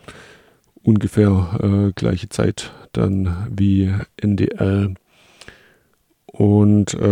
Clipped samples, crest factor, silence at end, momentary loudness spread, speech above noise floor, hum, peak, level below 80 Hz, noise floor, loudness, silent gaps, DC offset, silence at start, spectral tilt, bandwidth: under 0.1%; 16 dB; 0 s; 7 LU; 45 dB; none; -2 dBFS; -42 dBFS; -62 dBFS; -18 LUFS; none; under 0.1%; 0.1 s; -7.5 dB/octave; 11 kHz